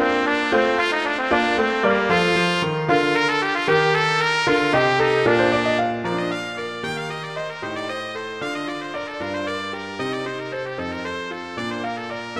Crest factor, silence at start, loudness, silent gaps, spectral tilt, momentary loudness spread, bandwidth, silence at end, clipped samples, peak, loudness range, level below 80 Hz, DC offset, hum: 18 dB; 0 s; -21 LUFS; none; -5 dB/octave; 11 LU; 12.5 kHz; 0 s; under 0.1%; -4 dBFS; 9 LU; -54 dBFS; 0.1%; none